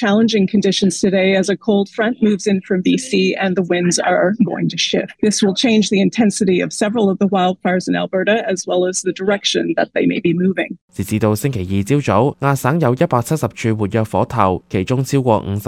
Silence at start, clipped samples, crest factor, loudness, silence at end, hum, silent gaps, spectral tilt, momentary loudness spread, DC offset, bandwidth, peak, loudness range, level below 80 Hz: 0 s; under 0.1%; 16 dB; -16 LUFS; 0 s; none; 10.81-10.88 s; -5 dB/octave; 4 LU; under 0.1%; 15.5 kHz; 0 dBFS; 2 LU; -52 dBFS